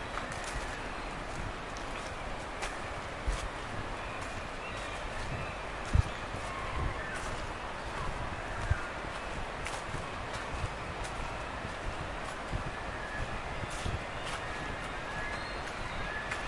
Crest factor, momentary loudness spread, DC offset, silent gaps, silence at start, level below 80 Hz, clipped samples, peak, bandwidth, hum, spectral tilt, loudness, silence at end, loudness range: 24 dB; 3 LU; under 0.1%; none; 0 s; -44 dBFS; under 0.1%; -12 dBFS; 11.5 kHz; none; -4.5 dB/octave; -38 LUFS; 0 s; 2 LU